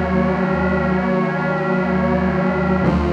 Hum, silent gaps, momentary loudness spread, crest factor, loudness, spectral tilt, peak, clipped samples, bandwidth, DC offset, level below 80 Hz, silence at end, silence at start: none; none; 2 LU; 14 dB; -18 LUFS; -9 dB/octave; -2 dBFS; under 0.1%; 6.6 kHz; under 0.1%; -32 dBFS; 0 s; 0 s